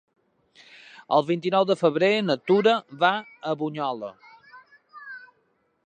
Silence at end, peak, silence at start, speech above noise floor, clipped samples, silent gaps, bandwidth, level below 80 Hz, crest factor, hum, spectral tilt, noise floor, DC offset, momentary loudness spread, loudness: 0.7 s; -6 dBFS; 1.1 s; 46 dB; under 0.1%; none; 9.6 kHz; -80 dBFS; 20 dB; none; -6 dB/octave; -69 dBFS; under 0.1%; 20 LU; -23 LUFS